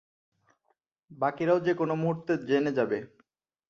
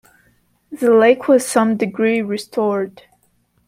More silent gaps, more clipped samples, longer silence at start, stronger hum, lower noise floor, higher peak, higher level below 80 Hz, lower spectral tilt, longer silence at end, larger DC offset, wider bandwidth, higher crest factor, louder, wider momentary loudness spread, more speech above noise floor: neither; neither; first, 1.1 s vs 0.7 s; neither; first, -76 dBFS vs -61 dBFS; second, -12 dBFS vs -2 dBFS; second, -72 dBFS vs -66 dBFS; first, -8 dB/octave vs -5 dB/octave; about the same, 0.65 s vs 0.75 s; neither; second, 7 kHz vs 16 kHz; about the same, 18 dB vs 16 dB; second, -28 LUFS vs -16 LUFS; second, 6 LU vs 11 LU; about the same, 48 dB vs 46 dB